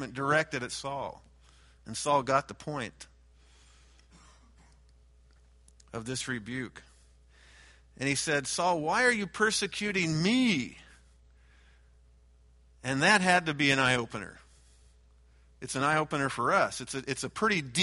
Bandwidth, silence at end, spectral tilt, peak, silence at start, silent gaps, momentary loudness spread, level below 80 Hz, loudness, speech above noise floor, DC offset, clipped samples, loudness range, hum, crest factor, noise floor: 11.5 kHz; 0 s; -3.5 dB/octave; -8 dBFS; 0 s; none; 15 LU; -60 dBFS; -29 LUFS; 31 dB; under 0.1%; under 0.1%; 13 LU; none; 22 dB; -60 dBFS